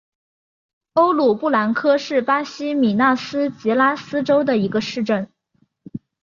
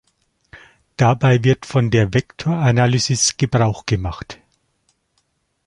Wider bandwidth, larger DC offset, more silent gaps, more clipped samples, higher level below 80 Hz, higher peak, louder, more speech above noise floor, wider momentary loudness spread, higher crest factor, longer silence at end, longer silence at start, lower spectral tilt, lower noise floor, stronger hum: second, 7.4 kHz vs 11.5 kHz; neither; neither; neither; second, -64 dBFS vs -42 dBFS; about the same, -4 dBFS vs -2 dBFS; about the same, -19 LUFS vs -17 LUFS; second, 46 dB vs 51 dB; about the same, 8 LU vs 10 LU; about the same, 16 dB vs 18 dB; second, 0.25 s vs 1.35 s; first, 0.95 s vs 0.55 s; about the same, -6 dB/octave vs -5 dB/octave; about the same, -64 dBFS vs -67 dBFS; neither